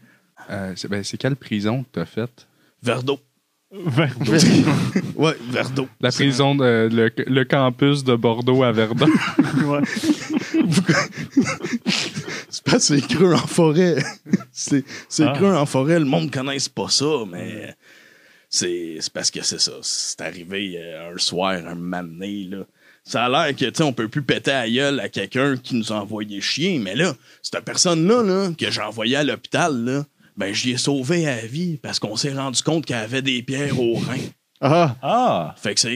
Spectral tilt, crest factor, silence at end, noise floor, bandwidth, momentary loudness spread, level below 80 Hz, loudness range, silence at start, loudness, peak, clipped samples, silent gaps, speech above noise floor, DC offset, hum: -4.5 dB/octave; 20 dB; 0 s; -52 dBFS; 15.5 kHz; 12 LU; -64 dBFS; 5 LU; 0.4 s; -20 LUFS; 0 dBFS; under 0.1%; none; 32 dB; under 0.1%; none